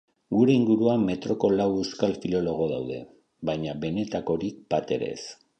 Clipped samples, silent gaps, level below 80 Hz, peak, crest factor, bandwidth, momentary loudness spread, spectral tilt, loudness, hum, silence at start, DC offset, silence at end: under 0.1%; none; -56 dBFS; -8 dBFS; 18 dB; 8.6 kHz; 11 LU; -7 dB/octave; -26 LUFS; none; 0.3 s; under 0.1%; 0.25 s